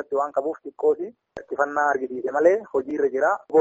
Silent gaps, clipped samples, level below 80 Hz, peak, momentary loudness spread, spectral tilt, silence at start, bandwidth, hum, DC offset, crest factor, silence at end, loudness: none; under 0.1%; -68 dBFS; -6 dBFS; 11 LU; -5.5 dB/octave; 0 s; 8 kHz; none; under 0.1%; 18 dB; 0 s; -23 LUFS